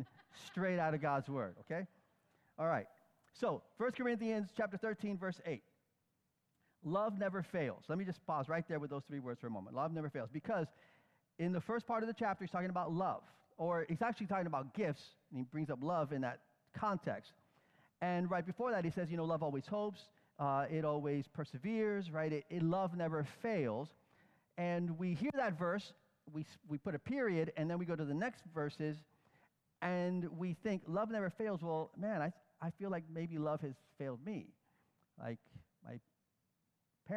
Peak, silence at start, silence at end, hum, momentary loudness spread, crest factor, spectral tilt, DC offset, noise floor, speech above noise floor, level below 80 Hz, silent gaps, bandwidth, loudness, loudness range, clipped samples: -24 dBFS; 0 s; 0 s; none; 11 LU; 18 dB; -8 dB/octave; under 0.1%; -84 dBFS; 44 dB; -78 dBFS; none; 11 kHz; -41 LUFS; 3 LU; under 0.1%